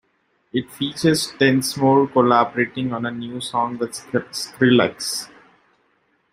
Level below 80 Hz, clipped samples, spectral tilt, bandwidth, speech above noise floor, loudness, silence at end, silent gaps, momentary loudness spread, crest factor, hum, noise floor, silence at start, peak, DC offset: -60 dBFS; under 0.1%; -4.5 dB/octave; 16 kHz; 46 dB; -20 LUFS; 1.05 s; none; 12 LU; 18 dB; none; -66 dBFS; 0.55 s; -2 dBFS; under 0.1%